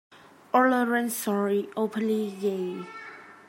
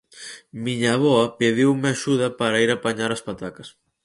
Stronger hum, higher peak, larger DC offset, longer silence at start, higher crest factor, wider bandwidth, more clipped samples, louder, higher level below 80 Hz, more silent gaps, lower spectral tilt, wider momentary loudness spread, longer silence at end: neither; second, -8 dBFS vs -4 dBFS; neither; about the same, 0.1 s vs 0.15 s; about the same, 18 dB vs 18 dB; first, 16.5 kHz vs 11.5 kHz; neither; second, -26 LUFS vs -21 LUFS; second, -84 dBFS vs -60 dBFS; neither; about the same, -5 dB/octave vs -5 dB/octave; about the same, 16 LU vs 16 LU; second, 0.15 s vs 0.35 s